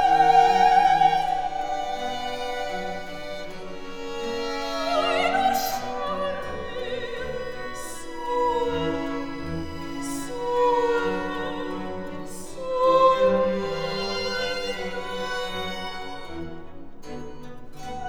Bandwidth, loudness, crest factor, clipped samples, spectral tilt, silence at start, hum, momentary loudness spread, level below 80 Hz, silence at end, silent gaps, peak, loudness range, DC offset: over 20 kHz; -25 LUFS; 20 dB; under 0.1%; -4 dB/octave; 0 s; none; 19 LU; -46 dBFS; 0 s; none; -4 dBFS; 7 LU; under 0.1%